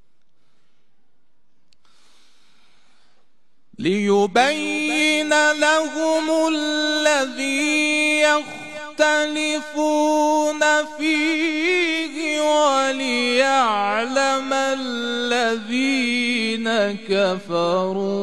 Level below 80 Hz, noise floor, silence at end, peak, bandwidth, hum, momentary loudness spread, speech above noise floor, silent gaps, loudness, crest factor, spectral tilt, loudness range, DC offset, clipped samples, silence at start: -64 dBFS; -72 dBFS; 0 s; -4 dBFS; 12.5 kHz; none; 6 LU; 52 dB; none; -19 LUFS; 18 dB; -3 dB/octave; 3 LU; 0.6%; under 0.1%; 3.8 s